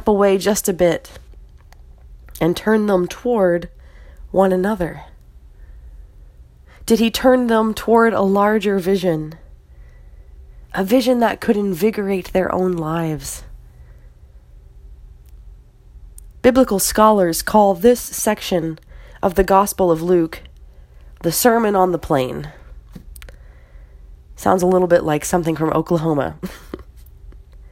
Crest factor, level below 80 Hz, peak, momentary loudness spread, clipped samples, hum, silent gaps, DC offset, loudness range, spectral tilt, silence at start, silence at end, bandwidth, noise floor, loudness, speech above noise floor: 18 dB; -40 dBFS; 0 dBFS; 13 LU; under 0.1%; none; none; under 0.1%; 6 LU; -5 dB/octave; 0 s; 0.05 s; 16.5 kHz; -44 dBFS; -17 LUFS; 28 dB